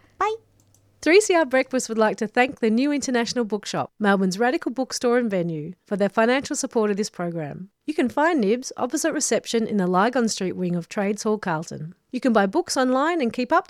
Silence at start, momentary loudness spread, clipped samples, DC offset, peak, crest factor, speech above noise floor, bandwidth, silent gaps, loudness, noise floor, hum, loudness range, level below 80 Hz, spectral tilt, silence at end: 0.2 s; 9 LU; under 0.1%; under 0.1%; -4 dBFS; 18 dB; 37 dB; 15 kHz; none; -22 LUFS; -59 dBFS; none; 3 LU; -64 dBFS; -4.5 dB/octave; 0.1 s